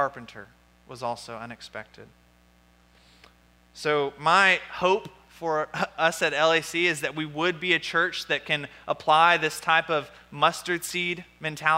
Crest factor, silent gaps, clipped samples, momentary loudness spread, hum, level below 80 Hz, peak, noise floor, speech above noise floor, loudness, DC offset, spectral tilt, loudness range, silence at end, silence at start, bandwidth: 20 dB; none; under 0.1%; 17 LU; 60 Hz at -60 dBFS; -64 dBFS; -6 dBFS; -59 dBFS; 33 dB; -24 LUFS; under 0.1%; -3 dB/octave; 13 LU; 0 s; 0 s; 16 kHz